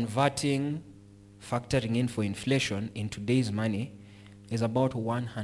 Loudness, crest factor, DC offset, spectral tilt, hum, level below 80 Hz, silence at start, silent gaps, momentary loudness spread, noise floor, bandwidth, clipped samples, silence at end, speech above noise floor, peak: -30 LUFS; 20 dB; under 0.1%; -6 dB/octave; none; -58 dBFS; 0 s; none; 9 LU; -52 dBFS; 12 kHz; under 0.1%; 0 s; 23 dB; -10 dBFS